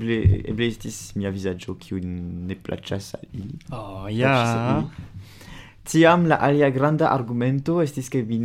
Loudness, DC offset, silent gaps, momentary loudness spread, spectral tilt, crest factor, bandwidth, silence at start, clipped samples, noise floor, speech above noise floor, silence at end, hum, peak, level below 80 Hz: -22 LUFS; under 0.1%; none; 17 LU; -6.5 dB/octave; 20 dB; 16 kHz; 0 s; under 0.1%; -42 dBFS; 20 dB; 0 s; none; -2 dBFS; -42 dBFS